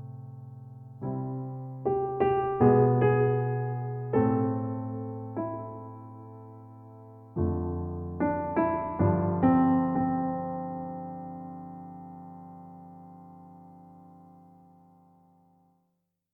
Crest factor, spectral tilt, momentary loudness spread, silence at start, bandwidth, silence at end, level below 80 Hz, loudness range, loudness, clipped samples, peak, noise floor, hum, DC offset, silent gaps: 20 dB; -12.5 dB/octave; 24 LU; 0 s; 3.1 kHz; 2.15 s; -54 dBFS; 18 LU; -28 LUFS; under 0.1%; -10 dBFS; -78 dBFS; none; under 0.1%; none